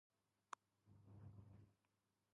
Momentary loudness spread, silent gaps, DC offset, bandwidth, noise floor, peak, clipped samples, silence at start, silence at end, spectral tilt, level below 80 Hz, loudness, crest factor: 7 LU; none; under 0.1%; 3.3 kHz; -89 dBFS; -34 dBFS; under 0.1%; 0.5 s; 0.55 s; -4.5 dB/octave; -80 dBFS; -64 LUFS; 32 dB